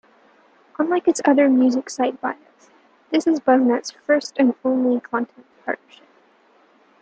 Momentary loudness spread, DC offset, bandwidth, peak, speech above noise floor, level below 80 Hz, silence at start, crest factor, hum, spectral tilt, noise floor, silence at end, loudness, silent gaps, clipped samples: 13 LU; under 0.1%; 9.2 kHz; -4 dBFS; 37 dB; -72 dBFS; 0.8 s; 18 dB; none; -4 dB/octave; -56 dBFS; 1.25 s; -20 LUFS; none; under 0.1%